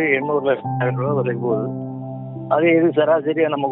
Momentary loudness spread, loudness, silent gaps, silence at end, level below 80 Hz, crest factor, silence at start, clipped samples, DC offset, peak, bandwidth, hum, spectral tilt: 14 LU; -19 LUFS; none; 0 s; -64 dBFS; 16 dB; 0 s; under 0.1%; under 0.1%; -4 dBFS; 3.9 kHz; none; -6 dB/octave